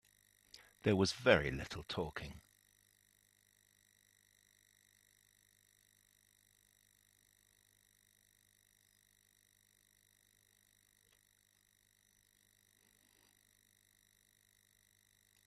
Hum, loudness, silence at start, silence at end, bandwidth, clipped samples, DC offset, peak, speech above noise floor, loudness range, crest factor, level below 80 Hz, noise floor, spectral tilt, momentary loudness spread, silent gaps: 50 Hz at -80 dBFS; -36 LUFS; 0.85 s; 13.05 s; 14.5 kHz; under 0.1%; under 0.1%; -12 dBFS; 39 dB; 18 LU; 32 dB; -66 dBFS; -74 dBFS; -5 dB/octave; 29 LU; none